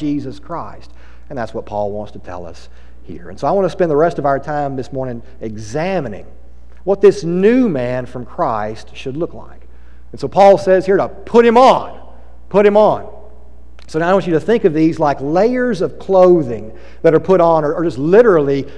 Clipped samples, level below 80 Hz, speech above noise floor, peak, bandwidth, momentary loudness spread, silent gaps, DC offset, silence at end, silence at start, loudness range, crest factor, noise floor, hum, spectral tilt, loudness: under 0.1%; -40 dBFS; 26 dB; 0 dBFS; 10.5 kHz; 18 LU; none; 3%; 0 s; 0 s; 7 LU; 14 dB; -40 dBFS; 60 Hz at -40 dBFS; -7 dB/octave; -14 LUFS